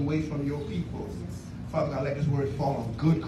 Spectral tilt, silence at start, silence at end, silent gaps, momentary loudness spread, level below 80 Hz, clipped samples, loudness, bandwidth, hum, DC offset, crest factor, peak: -8.5 dB/octave; 0 s; 0 s; none; 9 LU; -46 dBFS; under 0.1%; -30 LUFS; 12 kHz; none; under 0.1%; 16 dB; -12 dBFS